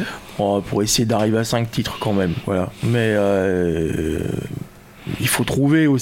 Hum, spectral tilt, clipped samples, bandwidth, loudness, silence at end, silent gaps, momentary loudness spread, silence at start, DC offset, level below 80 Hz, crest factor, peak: none; -5 dB/octave; under 0.1%; 17 kHz; -20 LUFS; 0 s; none; 11 LU; 0 s; under 0.1%; -42 dBFS; 14 dB; -6 dBFS